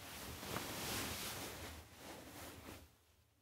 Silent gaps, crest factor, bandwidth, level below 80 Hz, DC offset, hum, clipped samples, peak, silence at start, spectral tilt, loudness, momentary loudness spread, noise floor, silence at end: none; 24 dB; 16 kHz; -64 dBFS; under 0.1%; none; under 0.1%; -26 dBFS; 0 s; -2.5 dB/octave; -47 LUFS; 13 LU; -72 dBFS; 0.2 s